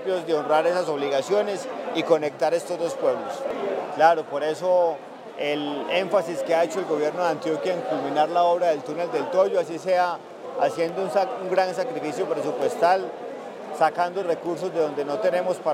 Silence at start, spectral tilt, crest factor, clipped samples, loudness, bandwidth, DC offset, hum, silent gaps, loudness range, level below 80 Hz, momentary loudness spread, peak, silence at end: 0 s; -4.5 dB/octave; 18 dB; under 0.1%; -24 LUFS; 15 kHz; under 0.1%; none; none; 2 LU; -82 dBFS; 8 LU; -4 dBFS; 0 s